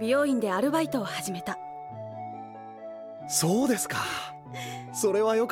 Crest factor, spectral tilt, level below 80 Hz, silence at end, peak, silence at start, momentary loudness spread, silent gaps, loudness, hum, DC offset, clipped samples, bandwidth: 16 dB; -4 dB/octave; -68 dBFS; 0 s; -12 dBFS; 0 s; 16 LU; none; -28 LUFS; none; under 0.1%; under 0.1%; 17 kHz